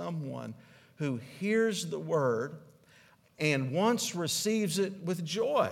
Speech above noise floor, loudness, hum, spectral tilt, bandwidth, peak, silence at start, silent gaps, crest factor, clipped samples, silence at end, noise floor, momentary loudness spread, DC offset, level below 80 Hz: 30 dB; -31 LUFS; none; -4.5 dB/octave; 17 kHz; -14 dBFS; 0 s; none; 18 dB; under 0.1%; 0 s; -61 dBFS; 12 LU; under 0.1%; -76 dBFS